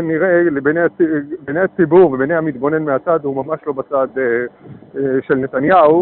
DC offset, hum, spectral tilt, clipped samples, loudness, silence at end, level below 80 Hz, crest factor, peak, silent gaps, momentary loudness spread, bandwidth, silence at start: under 0.1%; none; -6.5 dB/octave; under 0.1%; -15 LUFS; 0 s; -54 dBFS; 14 dB; -2 dBFS; none; 11 LU; 4.2 kHz; 0 s